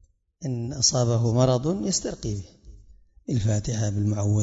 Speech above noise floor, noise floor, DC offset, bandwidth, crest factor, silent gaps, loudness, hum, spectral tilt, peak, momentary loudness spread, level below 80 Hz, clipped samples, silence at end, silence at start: 28 dB; -52 dBFS; under 0.1%; 8 kHz; 18 dB; none; -24 LUFS; none; -5 dB/octave; -8 dBFS; 12 LU; -46 dBFS; under 0.1%; 0 s; 0.4 s